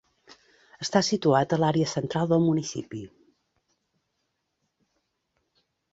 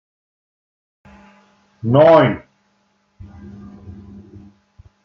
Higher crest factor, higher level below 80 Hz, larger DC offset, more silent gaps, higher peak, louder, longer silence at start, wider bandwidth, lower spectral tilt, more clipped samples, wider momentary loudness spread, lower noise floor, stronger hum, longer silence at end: about the same, 22 dB vs 20 dB; second, -64 dBFS vs -54 dBFS; neither; neither; second, -8 dBFS vs 0 dBFS; second, -25 LUFS vs -13 LUFS; second, 0.8 s vs 1.85 s; first, 8 kHz vs 6 kHz; second, -5.5 dB/octave vs -9 dB/octave; neither; second, 13 LU vs 29 LU; first, -78 dBFS vs -63 dBFS; neither; first, 2.85 s vs 1.15 s